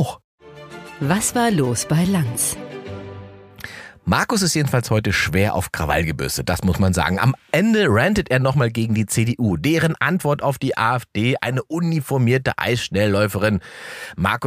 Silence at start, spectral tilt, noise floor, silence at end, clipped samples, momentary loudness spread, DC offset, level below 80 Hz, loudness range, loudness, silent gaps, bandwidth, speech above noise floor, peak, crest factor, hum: 0 s; -5 dB/octave; -39 dBFS; 0 s; under 0.1%; 15 LU; under 0.1%; -42 dBFS; 3 LU; -19 LUFS; 0.24-0.38 s; 15.5 kHz; 20 dB; -2 dBFS; 18 dB; none